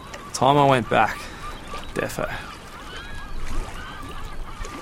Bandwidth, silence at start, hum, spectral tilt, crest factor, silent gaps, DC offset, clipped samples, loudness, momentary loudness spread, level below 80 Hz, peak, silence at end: 16.5 kHz; 0 s; none; -5 dB/octave; 22 dB; none; 0.1%; under 0.1%; -23 LUFS; 19 LU; -34 dBFS; -2 dBFS; 0 s